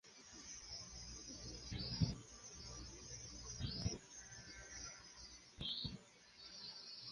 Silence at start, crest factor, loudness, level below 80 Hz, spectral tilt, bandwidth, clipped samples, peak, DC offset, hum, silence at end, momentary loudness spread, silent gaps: 0.05 s; 26 dB; -49 LUFS; -60 dBFS; -3.5 dB/octave; 11.5 kHz; under 0.1%; -24 dBFS; under 0.1%; none; 0 s; 12 LU; none